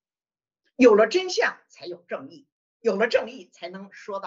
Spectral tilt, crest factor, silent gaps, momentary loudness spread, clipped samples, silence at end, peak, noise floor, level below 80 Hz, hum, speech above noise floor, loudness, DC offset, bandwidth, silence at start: -4 dB/octave; 20 dB; 2.52-2.80 s; 23 LU; under 0.1%; 0 s; -4 dBFS; under -90 dBFS; -72 dBFS; none; over 67 dB; -21 LUFS; under 0.1%; 7.6 kHz; 0.8 s